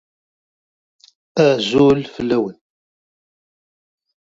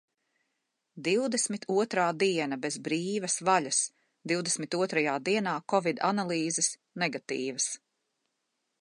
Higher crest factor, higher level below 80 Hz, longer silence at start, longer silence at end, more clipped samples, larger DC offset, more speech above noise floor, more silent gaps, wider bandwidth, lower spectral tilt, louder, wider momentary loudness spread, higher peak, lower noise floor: about the same, 20 dB vs 20 dB; first, -54 dBFS vs -82 dBFS; first, 1.35 s vs 0.95 s; first, 1.7 s vs 1.05 s; neither; neither; first, over 75 dB vs 52 dB; neither; second, 7.8 kHz vs 11.5 kHz; first, -6 dB/octave vs -3 dB/octave; first, -17 LUFS vs -29 LUFS; first, 10 LU vs 6 LU; first, 0 dBFS vs -12 dBFS; first, under -90 dBFS vs -81 dBFS